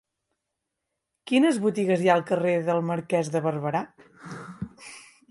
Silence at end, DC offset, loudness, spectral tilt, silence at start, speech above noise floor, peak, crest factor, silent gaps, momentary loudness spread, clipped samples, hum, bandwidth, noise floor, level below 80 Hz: 0.3 s; under 0.1%; -24 LUFS; -6 dB/octave; 1.25 s; 59 dB; -8 dBFS; 18 dB; none; 19 LU; under 0.1%; none; 11.5 kHz; -83 dBFS; -66 dBFS